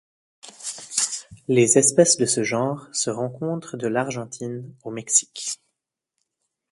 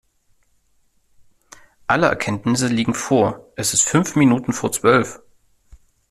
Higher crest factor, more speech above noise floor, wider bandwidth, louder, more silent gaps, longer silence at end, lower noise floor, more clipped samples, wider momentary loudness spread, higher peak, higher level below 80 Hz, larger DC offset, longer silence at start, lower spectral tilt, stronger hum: about the same, 22 dB vs 18 dB; first, 59 dB vs 43 dB; second, 11.5 kHz vs 14.5 kHz; second, -21 LUFS vs -18 LUFS; neither; first, 1.15 s vs 0.95 s; first, -81 dBFS vs -61 dBFS; neither; first, 17 LU vs 6 LU; about the same, -2 dBFS vs -2 dBFS; second, -66 dBFS vs -54 dBFS; neither; second, 0.45 s vs 1.9 s; about the same, -3.5 dB/octave vs -4.5 dB/octave; neither